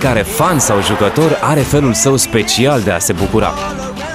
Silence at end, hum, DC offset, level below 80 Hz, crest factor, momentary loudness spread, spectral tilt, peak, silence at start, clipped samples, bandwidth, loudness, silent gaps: 0 s; none; under 0.1%; -32 dBFS; 12 dB; 5 LU; -4 dB/octave; 0 dBFS; 0 s; under 0.1%; 15.5 kHz; -13 LUFS; none